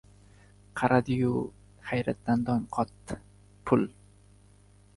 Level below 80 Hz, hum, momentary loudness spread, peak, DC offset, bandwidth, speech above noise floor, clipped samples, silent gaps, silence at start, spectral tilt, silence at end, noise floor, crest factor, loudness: -56 dBFS; 50 Hz at -50 dBFS; 16 LU; -10 dBFS; under 0.1%; 11.5 kHz; 30 dB; under 0.1%; none; 0.75 s; -7.5 dB/octave; 1.05 s; -58 dBFS; 22 dB; -29 LUFS